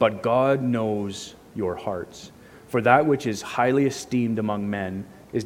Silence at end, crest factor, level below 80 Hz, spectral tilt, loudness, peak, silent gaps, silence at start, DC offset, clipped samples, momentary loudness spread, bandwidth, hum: 0 s; 22 dB; -60 dBFS; -6 dB/octave; -24 LUFS; -2 dBFS; none; 0 s; under 0.1%; under 0.1%; 15 LU; 16 kHz; none